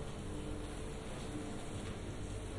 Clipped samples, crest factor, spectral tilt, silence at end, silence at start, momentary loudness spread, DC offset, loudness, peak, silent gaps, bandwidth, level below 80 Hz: under 0.1%; 12 dB; -5.5 dB/octave; 0 s; 0 s; 1 LU; under 0.1%; -45 LUFS; -30 dBFS; none; 11.5 kHz; -50 dBFS